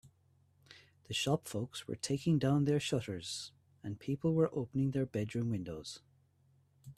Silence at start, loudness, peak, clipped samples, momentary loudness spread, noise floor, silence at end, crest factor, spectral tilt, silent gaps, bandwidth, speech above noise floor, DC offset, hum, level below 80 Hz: 0.05 s; -36 LUFS; -18 dBFS; under 0.1%; 14 LU; -70 dBFS; 0.05 s; 18 dB; -6 dB/octave; none; 13.5 kHz; 35 dB; under 0.1%; none; -66 dBFS